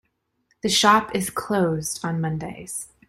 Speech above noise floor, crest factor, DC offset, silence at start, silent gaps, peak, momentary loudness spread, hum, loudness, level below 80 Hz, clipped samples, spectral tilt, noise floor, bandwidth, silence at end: 47 dB; 22 dB; under 0.1%; 0.65 s; none; -2 dBFS; 15 LU; none; -22 LUFS; -56 dBFS; under 0.1%; -3.5 dB/octave; -69 dBFS; 16 kHz; 0.25 s